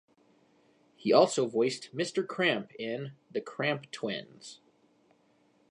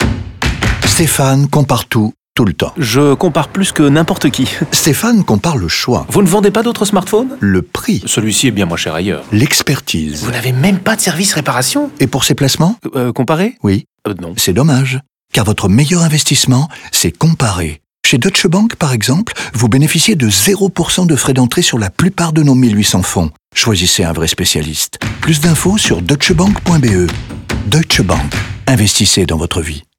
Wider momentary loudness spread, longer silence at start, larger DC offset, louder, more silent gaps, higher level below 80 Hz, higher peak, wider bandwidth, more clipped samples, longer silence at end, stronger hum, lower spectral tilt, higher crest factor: first, 15 LU vs 7 LU; first, 1 s vs 0 s; neither; second, -30 LUFS vs -12 LUFS; neither; second, -80 dBFS vs -32 dBFS; second, -8 dBFS vs 0 dBFS; second, 11 kHz vs 18.5 kHz; neither; first, 1.15 s vs 0.15 s; neither; about the same, -4.5 dB/octave vs -4.5 dB/octave; first, 24 dB vs 12 dB